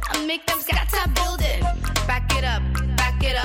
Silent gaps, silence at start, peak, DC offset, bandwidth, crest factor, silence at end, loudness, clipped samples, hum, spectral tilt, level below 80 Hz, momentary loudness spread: none; 0 s; -6 dBFS; under 0.1%; 17 kHz; 16 dB; 0 s; -22 LUFS; under 0.1%; none; -4 dB/octave; -24 dBFS; 2 LU